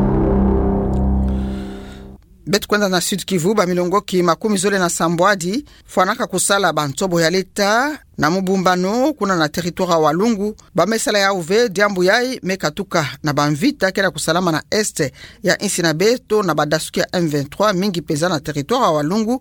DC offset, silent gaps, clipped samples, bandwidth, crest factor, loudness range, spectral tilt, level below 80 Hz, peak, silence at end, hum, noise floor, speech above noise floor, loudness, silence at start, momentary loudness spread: under 0.1%; none; under 0.1%; 18.5 kHz; 16 dB; 2 LU; -4.5 dB/octave; -32 dBFS; -2 dBFS; 0 s; none; -39 dBFS; 21 dB; -17 LUFS; 0 s; 6 LU